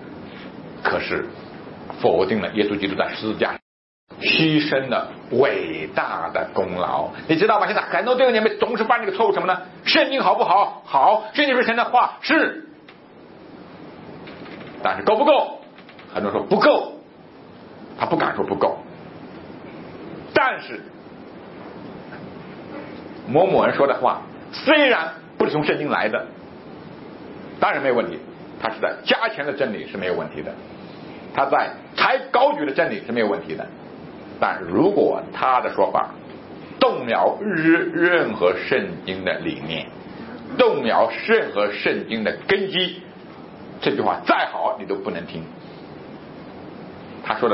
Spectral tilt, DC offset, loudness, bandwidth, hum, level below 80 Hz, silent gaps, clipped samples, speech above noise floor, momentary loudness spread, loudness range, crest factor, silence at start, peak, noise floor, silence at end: -9 dB/octave; under 0.1%; -20 LUFS; 5.8 kHz; none; -60 dBFS; 3.62-4.07 s; under 0.1%; 25 dB; 21 LU; 7 LU; 20 dB; 0 s; -2 dBFS; -45 dBFS; 0 s